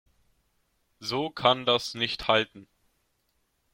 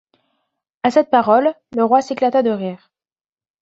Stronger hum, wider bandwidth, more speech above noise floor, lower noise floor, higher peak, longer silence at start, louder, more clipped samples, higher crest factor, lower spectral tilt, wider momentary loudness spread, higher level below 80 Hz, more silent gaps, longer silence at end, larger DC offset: neither; first, 16.5 kHz vs 8 kHz; second, 47 dB vs over 74 dB; second, -74 dBFS vs under -90 dBFS; second, -6 dBFS vs -2 dBFS; first, 1 s vs 0.85 s; second, -26 LUFS vs -16 LUFS; neither; first, 24 dB vs 16 dB; second, -4 dB/octave vs -6 dB/octave; about the same, 10 LU vs 8 LU; first, -60 dBFS vs -66 dBFS; neither; first, 1.1 s vs 0.85 s; neither